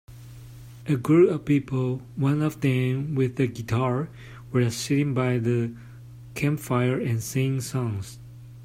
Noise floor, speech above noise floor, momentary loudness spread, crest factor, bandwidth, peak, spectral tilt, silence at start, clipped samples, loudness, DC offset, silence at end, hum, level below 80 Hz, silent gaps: -43 dBFS; 19 dB; 22 LU; 16 dB; 16 kHz; -8 dBFS; -7 dB/octave; 0.1 s; under 0.1%; -25 LUFS; under 0.1%; 0 s; none; -54 dBFS; none